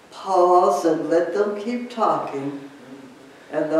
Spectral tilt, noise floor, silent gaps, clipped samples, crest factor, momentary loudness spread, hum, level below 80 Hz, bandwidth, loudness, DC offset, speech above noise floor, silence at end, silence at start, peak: -5.5 dB/octave; -44 dBFS; none; under 0.1%; 16 dB; 16 LU; none; -76 dBFS; 13 kHz; -21 LUFS; under 0.1%; 24 dB; 0 s; 0.1 s; -6 dBFS